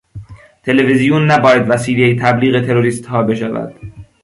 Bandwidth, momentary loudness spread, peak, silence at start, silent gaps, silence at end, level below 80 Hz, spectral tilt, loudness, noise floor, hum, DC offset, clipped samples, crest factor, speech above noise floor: 11.5 kHz; 10 LU; 0 dBFS; 0.15 s; none; 0.2 s; -46 dBFS; -6.5 dB/octave; -13 LUFS; -34 dBFS; none; under 0.1%; under 0.1%; 14 dB; 22 dB